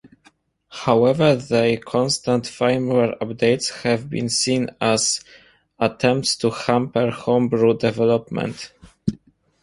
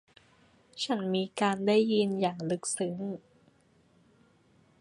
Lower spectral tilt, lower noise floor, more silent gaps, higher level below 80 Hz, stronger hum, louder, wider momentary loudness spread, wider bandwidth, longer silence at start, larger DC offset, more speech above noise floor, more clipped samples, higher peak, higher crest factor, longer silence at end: about the same, -4.5 dB/octave vs -4.5 dB/octave; second, -58 dBFS vs -65 dBFS; neither; first, -54 dBFS vs -74 dBFS; neither; first, -20 LUFS vs -30 LUFS; second, 10 LU vs 13 LU; about the same, 11.5 kHz vs 11.5 kHz; about the same, 0.7 s vs 0.75 s; neither; about the same, 38 dB vs 36 dB; neither; first, -2 dBFS vs -12 dBFS; about the same, 20 dB vs 20 dB; second, 0.5 s vs 1.6 s